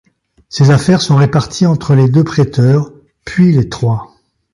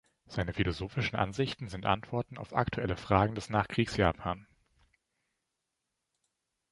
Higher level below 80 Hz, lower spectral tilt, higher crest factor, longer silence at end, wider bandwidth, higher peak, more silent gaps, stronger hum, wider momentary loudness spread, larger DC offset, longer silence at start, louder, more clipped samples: first, -42 dBFS vs -50 dBFS; about the same, -7 dB/octave vs -6.5 dB/octave; second, 12 dB vs 26 dB; second, 0.5 s vs 2.3 s; about the same, 11.5 kHz vs 11.5 kHz; first, 0 dBFS vs -8 dBFS; neither; neither; about the same, 11 LU vs 9 LU; neither; first, 0.55 s vs 0.3 s; first, -11 LUFS vs -32 LUFS; neither